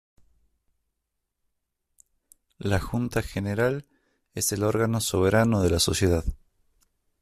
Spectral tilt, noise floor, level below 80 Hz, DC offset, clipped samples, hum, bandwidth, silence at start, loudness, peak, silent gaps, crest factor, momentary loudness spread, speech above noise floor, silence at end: -5 dB/octave; -81 dBFS; -44 dBFS; under 0.1%; under 0.1%; none; 15 kHz; 2.6 s; -25 LUFS; -8 dBFS; none; 18 dB; 10 LU; 57 dB; 0.85 s